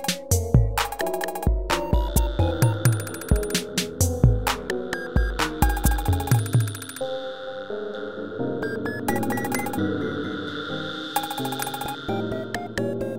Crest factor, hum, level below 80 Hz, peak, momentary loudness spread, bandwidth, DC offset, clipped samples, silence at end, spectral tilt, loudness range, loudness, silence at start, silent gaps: 20 dB; none; -30 dBFS; -4 dBFS; 9 LU; 16.5 kHz; 0.5%; under 0.1%; 0 s; -5 dB/octave; 5 LU; -25 LUFS; 0 s; none